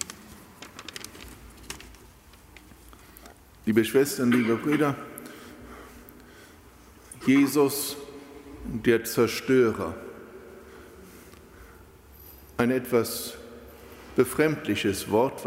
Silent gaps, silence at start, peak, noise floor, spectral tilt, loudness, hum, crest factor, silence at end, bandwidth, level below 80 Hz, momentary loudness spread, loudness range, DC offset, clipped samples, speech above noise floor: none; 0 s; -8 dBFS; -52 dBFS; -5 dB/octave; -25 LUFS; none; 20 dB; 0 s; 16 kHz; -54 dBFS; 25 LU; 8 LU; under 0.1%; under 0.1%; 28 dB